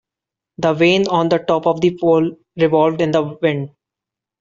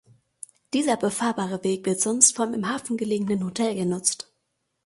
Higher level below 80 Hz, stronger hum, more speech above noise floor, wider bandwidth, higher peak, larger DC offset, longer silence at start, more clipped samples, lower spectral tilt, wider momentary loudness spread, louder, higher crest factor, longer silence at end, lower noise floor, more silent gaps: first, -56 dBFS vs -66 dBFS; neither; first, 70 dB vs 52 dB; second, 7.4 kHz vs 12 kHz; about the same, -2 dBFS vs -2 dBFS; neither; second, 0.6 s vs 0.75 s; neither; first, -5 dB/octave vs -3.5 dB/octave; second, 7 LU vs 17 LU; first, -16 LUFS vs -23 LUFS; second, 14 dB vs 24 dB; about the same, 0.75 s vs 0.65 s; first, -86 dBFS vs -76 dBFS; neither